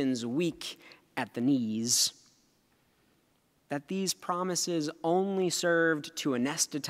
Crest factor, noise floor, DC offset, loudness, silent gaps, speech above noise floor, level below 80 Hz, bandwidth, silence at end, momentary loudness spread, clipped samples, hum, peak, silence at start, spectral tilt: 16 dB; -70 dBFS; under 0.1%; -30 LUFS; none; 40 dB; -76 dBFS; 16 kHz; 0 s; 13 LU; under 0.1%; none; -14 dBFS; 0 s; -3 dB/octave